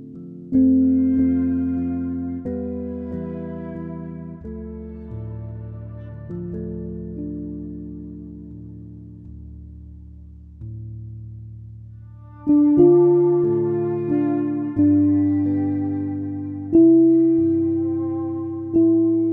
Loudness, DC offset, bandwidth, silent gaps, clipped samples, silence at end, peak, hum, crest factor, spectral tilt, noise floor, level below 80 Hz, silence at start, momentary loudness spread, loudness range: -20 LUFS; under 0.1%; 2.6 kHz; none; under 0.1%; 0 s; -4 dBFS; none; 18 dB; -13.5 dB/octave; -41 dBFS; -44 dBFS; 0 s; 23 LU; 20 LU